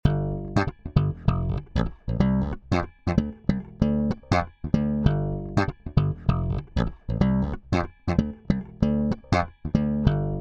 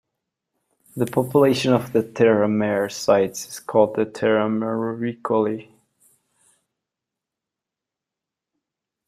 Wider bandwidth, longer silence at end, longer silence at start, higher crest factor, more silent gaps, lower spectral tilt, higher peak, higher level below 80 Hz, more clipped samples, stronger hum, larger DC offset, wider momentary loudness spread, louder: second, 8 kHz vs 15.5 kHz; second, 0 s vs 3.45 s; second, 0.05 s vs 0.95 s; about the same, 20 dB vs 20 dB; neither; first, -8.5 dB/octave vs -6 dB/octave; about the same, -4 dBFS vs -2 dBFS; first, -34 dBFS vs -64 dBFS; neither; neither; neither; second, 5 LU vs 9 LU; second, -26 LUFS vs -21 LUFS